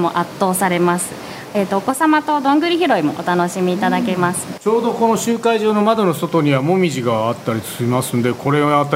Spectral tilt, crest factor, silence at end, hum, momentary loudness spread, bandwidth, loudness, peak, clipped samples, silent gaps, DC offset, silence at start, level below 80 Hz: -5.5 dB/octave; 16 dB; 0 s; none; 6 LU; 16 kHz; -17 LUFS; 0 dBFS; under 0.1%; none; under 0.1%; 0 s; -58 dBFS